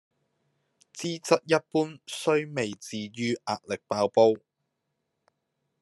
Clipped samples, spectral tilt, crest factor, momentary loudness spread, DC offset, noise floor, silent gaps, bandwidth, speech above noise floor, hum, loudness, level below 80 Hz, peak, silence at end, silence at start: under 0.1%; -4.5 dB/octave; 22 dB; 13 LU; under 0.1%; -81 dBFS; none; 12.5 kHz; 54 dB; none; -27 LUFS; -76 dBFS; -6 dBFS; 1.45 s; 0.95 s